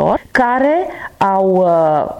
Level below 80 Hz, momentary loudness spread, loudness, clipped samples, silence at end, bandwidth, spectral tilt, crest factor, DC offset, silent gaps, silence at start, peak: -46 dBFS; 6 LU; -14 LUFS; under 0.1%; 0 s; 13 kHz; -7.5 dB/octave; 10 dB; under 0.1%; none; 0 s; -4 dBFS